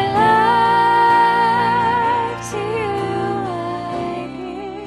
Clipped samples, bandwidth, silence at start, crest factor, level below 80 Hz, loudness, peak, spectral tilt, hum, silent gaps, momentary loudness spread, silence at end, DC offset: under 0.1%; 13 kHz; 0 s; 14 dB; -48 dBFS; -17 LUFS; -2 dBFS; -5 dB/octave; none; none; 12 LU; 0 s; under 0.1%